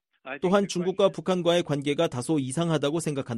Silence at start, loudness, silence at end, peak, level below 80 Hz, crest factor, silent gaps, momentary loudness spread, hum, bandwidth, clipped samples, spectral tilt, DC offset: 0.25 s; -26 LUFS; 0 s; -8 dBFS; -64 dBFS; 16 dB; none; 4 LU; none; 13 kHz; under 0.1%; -5.5 dB/octave; under 0.1%